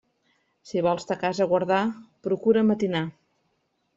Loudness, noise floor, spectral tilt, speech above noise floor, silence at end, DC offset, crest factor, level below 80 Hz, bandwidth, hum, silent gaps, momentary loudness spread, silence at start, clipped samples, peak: -25 LUFS; -73 dBFS; -6.5 dB/octave; 49 dB; 0.85 s; under 0.1%; 18 dB; -66 dBFS; 7.8 kHz; none; none; 10 LU; 0.65 s; under 0.1%; -8 dBFS